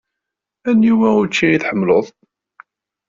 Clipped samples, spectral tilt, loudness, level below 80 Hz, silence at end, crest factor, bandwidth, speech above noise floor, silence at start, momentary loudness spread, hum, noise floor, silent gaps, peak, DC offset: under 0.1%; -5 dB/octave; -15 LUFS; -56 dBFS; 1 s; 14 dB; 7.6 kHz; 68 dB; 0.65 s; 7 LU; none; -82 dBFS; none; -2 dBFS; under 0.1%